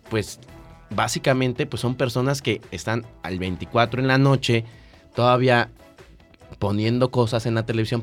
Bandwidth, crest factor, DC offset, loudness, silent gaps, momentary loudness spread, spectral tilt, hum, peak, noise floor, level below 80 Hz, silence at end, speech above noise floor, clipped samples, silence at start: 16 kHz; 18 dB; under 0.1%; -22 LUFS; none; 11 LU; -6 dB/octave; none; -4 dBFS; -49 dBFS; -50 dBFS; 0 s; 27 dB; under 0.1%; 0.05 s